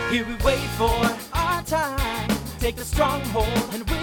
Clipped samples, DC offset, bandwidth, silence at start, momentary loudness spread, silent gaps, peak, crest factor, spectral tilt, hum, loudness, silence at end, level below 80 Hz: under 0.1%; under 0.1%; 19.5 kHz; 0 s; 4 LU; none; -6 dBFS; 16 dB; -4.5 dB/octave; none; -24 LUFS; 0 s; -32 dBFS